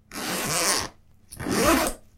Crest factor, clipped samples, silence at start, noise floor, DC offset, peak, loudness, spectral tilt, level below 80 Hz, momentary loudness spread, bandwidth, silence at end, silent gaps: 20 dB; under 0.1%; 0.1 s; -48 dBFS; under 0.1%; -6 dBFS; -23 LUFS; -2.5 dB/octave; -44 dBFS; 12 LU; 16.5 kHz; 0.2 s; none